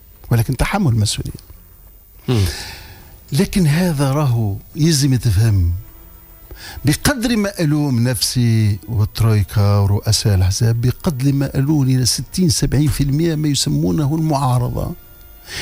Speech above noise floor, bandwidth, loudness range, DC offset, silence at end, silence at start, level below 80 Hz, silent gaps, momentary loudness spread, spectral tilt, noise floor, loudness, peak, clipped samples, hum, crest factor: 27 dB; 16 kHz; 4 LU; under 0.1%; 0 s; 0.2 s; -34 dBFS; none; 8 LU; -5.5 dB/octave; -43 dBFS; -17 LUFS; -6 dBFS; under 0.1%; none; 12 dB